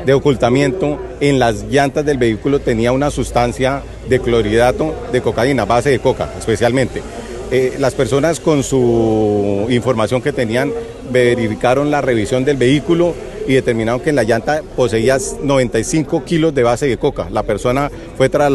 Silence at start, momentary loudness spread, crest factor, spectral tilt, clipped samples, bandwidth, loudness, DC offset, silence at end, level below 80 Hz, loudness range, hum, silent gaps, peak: 0 s; 5 LU; 14 dB; -6 dB/octave; under 0.1%; 12.5 kHz; -15 LUFS; under 0.1%; 0 s; -34 dBFS; 1 LU; none; none; 0 dBFS